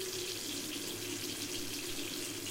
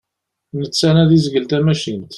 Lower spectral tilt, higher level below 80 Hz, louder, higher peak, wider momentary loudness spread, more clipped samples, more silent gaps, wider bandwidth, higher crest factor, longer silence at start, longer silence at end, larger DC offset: second, -2 dB/octave vs -6 dB/octave; second, -62 dBFS vs -48 dBFS; second, -38 LUFS vs -15 LUFS; second, -24 dBFS vs -2 dBFS; second, 1 LU vs 12 LU; neither; neither; first, 16 kHz vs 11.5 kHz; about the same, 16 dB vs 14 dB; second, 0 s vs 0.55 s; about the same, 0 s vs 0 s; neither